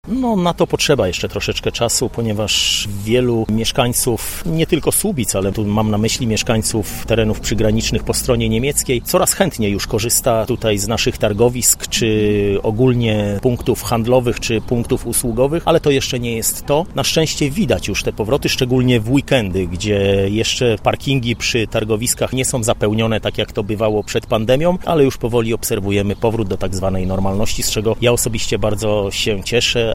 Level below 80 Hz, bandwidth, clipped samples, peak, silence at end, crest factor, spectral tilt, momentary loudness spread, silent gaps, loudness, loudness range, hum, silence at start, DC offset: -32 dBFS; 16.5 kHz; under 0.1%; 0 dBFS; 0 s; 16 dB; -4.5 dB/octave; 5 LU; none; -17 LUFS; 2 LU; none; 0.05 s; under 0.1%